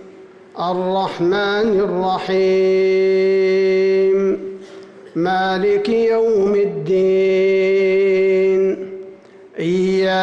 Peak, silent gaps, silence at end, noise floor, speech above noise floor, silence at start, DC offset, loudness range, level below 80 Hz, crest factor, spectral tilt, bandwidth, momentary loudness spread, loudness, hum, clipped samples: -10 dBFS; none; 0 s; -41 dBFS; 25 dB; 0 s; under 0.1%; 2 LU; -56 dBFS; 8 dB; -7 dB/octave; 7.4 kHz; 10 LU; -16 LUFS; none; under 0.1%